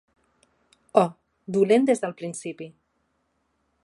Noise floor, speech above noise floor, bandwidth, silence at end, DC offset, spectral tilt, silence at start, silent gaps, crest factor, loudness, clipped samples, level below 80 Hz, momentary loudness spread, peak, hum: -72 dBFS; 49 dB; 11.5 kHz; 1.15 s; under 0.1%; -6 dB/octave; 0.95 s; none; 24 dB; -24 LUFS; under 0.1%; -76 dBFS; 21 LU; -2 dBFS; none